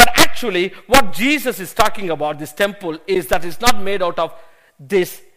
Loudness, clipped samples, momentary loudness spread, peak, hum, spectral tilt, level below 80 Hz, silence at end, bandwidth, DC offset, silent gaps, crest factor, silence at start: -18 LUFS; 0.2%; 8 LU; 0 dBFS; none; -3 dB/octave; -36 dBFS; 0 s; 15.5 kHz; under 0.1%; none; 16 dB; 0 s